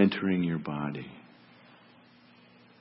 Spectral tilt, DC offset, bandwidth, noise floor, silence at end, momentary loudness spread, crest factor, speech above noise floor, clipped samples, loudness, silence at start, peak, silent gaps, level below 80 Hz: -10.5 dB/octave; under 0.1%; 5.8 kHz; -58 dBFS; 1.6 s; 19 LU; 22 dB; 27 dB; under 0.1%; -31 LUFS; 0 s; -10 dBFS; none; -68 dBFS